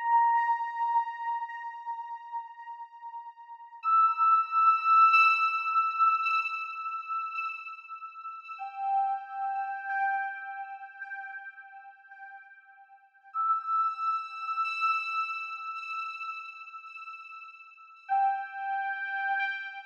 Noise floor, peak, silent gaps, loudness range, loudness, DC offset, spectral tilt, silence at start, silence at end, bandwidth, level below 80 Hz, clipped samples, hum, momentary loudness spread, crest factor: -57 dBFS; -12 dBFS; none; 12 LU; -28 LUFS; under 0.1%; 4.5 dB/octave; 0 s; 0 s; 7 kHz; under -90 dBFS; under 0.1%; none; 21 LU; 18 dB